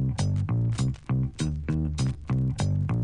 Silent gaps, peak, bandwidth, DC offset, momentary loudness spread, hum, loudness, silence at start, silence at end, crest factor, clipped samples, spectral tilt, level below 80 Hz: none; -14 dBFS; 10.5 kHz; under 0.1%; 3 LU; none; -28 LUFS; 0 s; 0 s; 12 dB; under 0.1%; -7 dB/octave; -38 dBFS